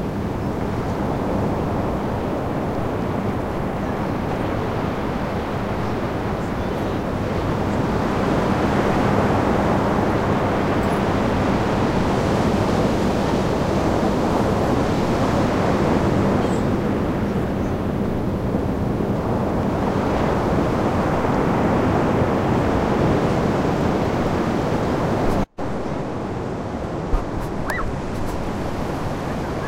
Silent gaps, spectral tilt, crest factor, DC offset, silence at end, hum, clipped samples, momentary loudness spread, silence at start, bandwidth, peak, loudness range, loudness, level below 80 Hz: none; -7 dB/octave; 16 dB; 0.5%; 0 s; none; under 0.1%; 7 LU; 0 s; 16 kHz; -4 dBFS; 4 LU; -21 LUFS; -32 dBFS